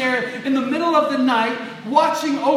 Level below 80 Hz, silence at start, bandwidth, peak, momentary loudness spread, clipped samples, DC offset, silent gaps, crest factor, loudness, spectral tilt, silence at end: -80 dBFS; 0 s; 14.5 kHz; -2 dBFS; 5 LU; under 0.1%; under 0.1%; none; 18 dB; -19 LUFS; -4 dB/octave; 0 s